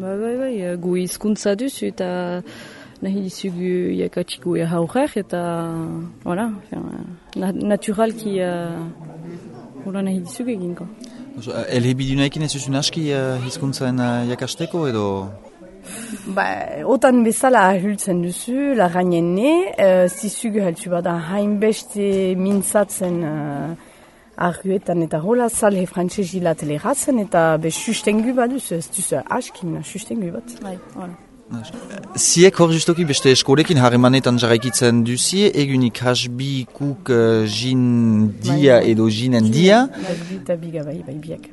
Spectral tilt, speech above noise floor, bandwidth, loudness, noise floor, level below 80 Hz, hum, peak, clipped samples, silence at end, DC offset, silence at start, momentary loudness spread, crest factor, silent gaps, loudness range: -5 dB/octave; 28 dB; 12 kHz; -19 LUFS; -47 dBFS; -52 dBFS; none; 0 dBFS; under 0.1%; 0 s; under 0.1%; 0 s; 17 LU; 18 dB; none; 9 LU